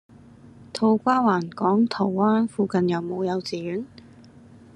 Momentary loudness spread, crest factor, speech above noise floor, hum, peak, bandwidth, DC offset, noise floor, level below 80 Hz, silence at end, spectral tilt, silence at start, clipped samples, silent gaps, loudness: 11 LU; 16 dB; 26 dB; none; -8 dBFS; 10.5 kHz; under 0.1%; -48 dBFS; -66 dBFS; 0.9 s; -7 dB/octave; 0.45 s; under 0.1%; none; -23 LUFS